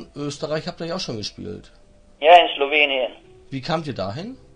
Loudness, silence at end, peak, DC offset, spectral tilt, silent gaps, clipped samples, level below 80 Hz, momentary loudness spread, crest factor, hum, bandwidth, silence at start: -20 LUFS; 0.2 s; 0 dBFS; under 0.1%; -4.5 dB/octave; none; under 0.1%; -52 dBFS; 21 LU; 22 dB; none; 10 kHz; 0 s